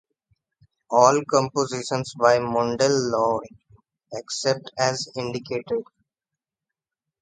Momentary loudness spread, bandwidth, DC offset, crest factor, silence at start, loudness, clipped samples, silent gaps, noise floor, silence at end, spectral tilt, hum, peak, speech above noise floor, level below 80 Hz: 12 LU; 9.6 kHz; under 0.1%; 22 dB; 0.9 s; -23 LUFS; under 0.1%; none; -88 dBFS; 1.4 s; -4 dB/octave; none; -2 dBFS; 66 dB; -62 dBFS